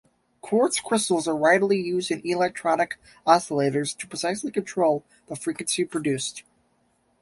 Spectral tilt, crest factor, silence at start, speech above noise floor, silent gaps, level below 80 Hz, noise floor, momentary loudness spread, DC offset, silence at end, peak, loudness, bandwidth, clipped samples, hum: -4 dB/octave; 22 dB; 0.45 s; 43 dB; none; -66 dBFS; -67 dBFS; 10 LU; under 0.1%; 0.8 s; -4 dBFS; -24 LUFS; 12 kHz; under 0.1%; none